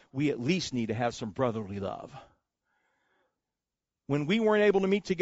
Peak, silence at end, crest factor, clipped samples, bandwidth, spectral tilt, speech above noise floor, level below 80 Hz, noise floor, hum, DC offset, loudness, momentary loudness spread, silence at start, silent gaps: -14 dBFS; 0 s; 18 dB; under 0.1%; 8 kHz; -5 dB/octave; 61 dB; -64 dBFS; -90 dBFS; none; under 0.1%; -29 LUFS; 13 LU; 0.15 s; none